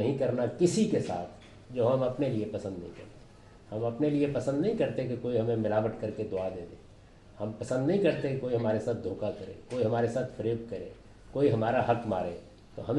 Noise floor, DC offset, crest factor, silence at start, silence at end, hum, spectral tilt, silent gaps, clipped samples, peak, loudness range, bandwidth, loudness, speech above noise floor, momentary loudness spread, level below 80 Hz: -54 dBFS; under 0.1%; 18 dB; 0 s; 0 s; none; -7 dB/octave; none; under 0.1%; -12 dBFS; 2 LU; 11.5 kHz; -30 LUFS; 24 dB; 14 LU; -58 dBFS